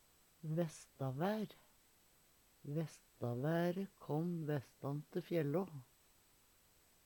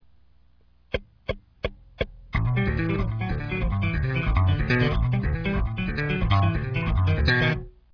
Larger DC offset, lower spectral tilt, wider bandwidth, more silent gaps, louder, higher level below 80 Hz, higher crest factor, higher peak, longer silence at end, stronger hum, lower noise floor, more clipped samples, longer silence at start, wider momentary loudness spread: neither; about the same, -7.5 dB/octave vs -8 dB/octave; first, 19 kHz vs 5.4 kHz; neither; second, -42 LUFS vs -26 LUFS; second, -78 dBFS vs -32 dBFS; about the same, 18 dB vs 16 dB; second, -24 dBFS vs -8 dBFS; first, 1.2 s vs 0.25 s; second, none vs 60 Hz at -45 dBFS; first, -71 dBFS vs -60 dBFS; neither; second, 0.45 s vs 0.95 s; about the same, 11 LU vs 11 LU